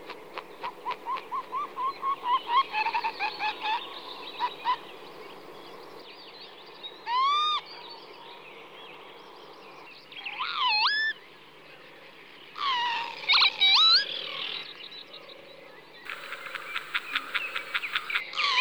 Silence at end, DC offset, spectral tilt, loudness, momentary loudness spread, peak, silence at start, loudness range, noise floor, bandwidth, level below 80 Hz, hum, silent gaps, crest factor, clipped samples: 0 s; 0.2%; -0.5 dB/octave; -26 LUFS; 24 LU; -10 dBFS; 0 s; 12 LU; -51 dBFS; over 20 kHz; -78 dBFS; none; none; 22 dB; under 0.1%